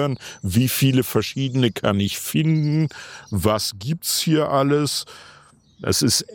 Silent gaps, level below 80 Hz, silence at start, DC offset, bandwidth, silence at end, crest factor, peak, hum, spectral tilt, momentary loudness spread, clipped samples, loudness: none; -52 dBFS; 0 s; under 0.1%; 17.5 kHz; 0 s; 18 dB; -4 dBFS; none; -5 dB/octave; 9 LU; under 0.1%; -21 LUFS